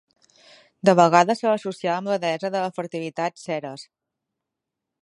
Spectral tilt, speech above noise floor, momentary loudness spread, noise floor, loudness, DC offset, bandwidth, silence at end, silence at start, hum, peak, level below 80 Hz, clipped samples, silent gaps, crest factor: -5.5 dB/octave; 62 dB; 14 LU; -84 dBFS; -22 LUFS; under 0.1%; 11.5 kHz; 1.2 s; 0.85 s; none; 0 dBFS; -76 dBFS; under 0.1%; none; 22 dB